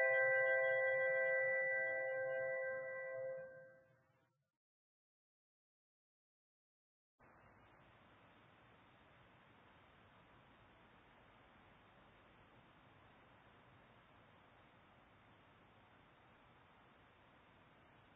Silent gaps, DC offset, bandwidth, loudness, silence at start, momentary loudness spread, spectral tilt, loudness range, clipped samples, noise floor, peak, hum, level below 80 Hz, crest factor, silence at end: none; under 0.1%; 3.8 kHz; -38 LUFS; 0 s; 14 LU; 3.5 dB/octave; 28 LU; under 0.1%; -80 dBFS; -26 dBFS; none; -82 dBFS; 20 dB; 14.45 s